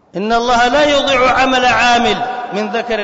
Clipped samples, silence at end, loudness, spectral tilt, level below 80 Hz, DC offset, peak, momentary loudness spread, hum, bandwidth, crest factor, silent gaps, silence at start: under 0.1%; 0 s; -12 LUFS; -3 dB/octave; -38 dBFS; under 0.1%; -4 dBFS; 8 LU; none; 7.8 kHz; 10 dB; none; 0.15 s